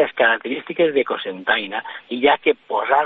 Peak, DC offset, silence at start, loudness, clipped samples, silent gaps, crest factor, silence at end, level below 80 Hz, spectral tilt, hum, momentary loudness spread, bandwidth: -2 dBFS; under 0.1%; 0 s; -20 LUFS; under 0.1%; none; 16 dB; 0 s; -64 dBFS; -6.5 dB/octave; none; 10 LU; 4.3 kHz